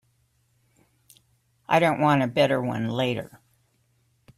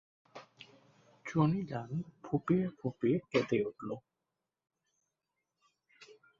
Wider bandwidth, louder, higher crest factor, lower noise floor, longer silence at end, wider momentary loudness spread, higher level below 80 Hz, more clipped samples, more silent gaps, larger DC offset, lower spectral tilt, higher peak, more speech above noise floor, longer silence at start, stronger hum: first, 15 kHz vs 7.4 kHz; first, -23 LUFS vs -34 LUFS; about the same, 22 dB vs 22 dB; second, -67 dBFS vs -89 dBFS; first, 1.1 s vs 0.25 s; second, 8 LU vs 23 LU; first, -64 dBFS vs -70 dBFS; neither; neither; neither; second, -6.5 dB/octave vs -8 dB/octave; first, -6 dBFS vs -16 dBFS; second, 45 dB vs 56 dB; first, 1.7 s vs 0.35 s; neither